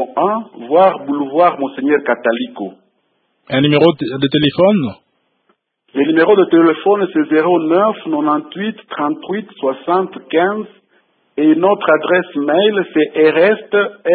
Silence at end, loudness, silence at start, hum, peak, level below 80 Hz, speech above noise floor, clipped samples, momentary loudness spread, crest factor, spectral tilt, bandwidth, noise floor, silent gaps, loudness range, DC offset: 0 s; -14 LUFS; 0 s; none; 0 dBFS; -60 dBFS; 50 dB; under 0.1%; 12 LU; 14 dB; -9.5 dB/octave; 4.7 kHz; -64 dBFS; none; 4 LU; under 0.1%